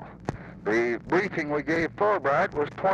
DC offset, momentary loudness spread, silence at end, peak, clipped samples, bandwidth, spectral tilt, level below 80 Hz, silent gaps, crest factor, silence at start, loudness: under 0.1%; 12 LU; 0 s; -12 dBFS; under 0.1%; 8.8 kHz; -6.5 dB/octave; -54 dBFS; none; 14 dB; 0 s; -26 LUFS